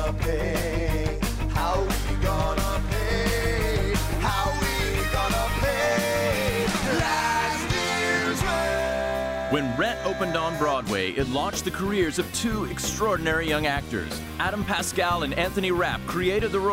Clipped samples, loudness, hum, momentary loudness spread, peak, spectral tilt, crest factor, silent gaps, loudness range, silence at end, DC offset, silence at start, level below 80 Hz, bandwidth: under 0.1%; -25 LUFS; none; 4 LU; -12 dBFS; -4.5 dB/octave; 12 dB; none; 2 LU; 0 s; under 0.1%; 0 s; -32 dBFS; 16 kHz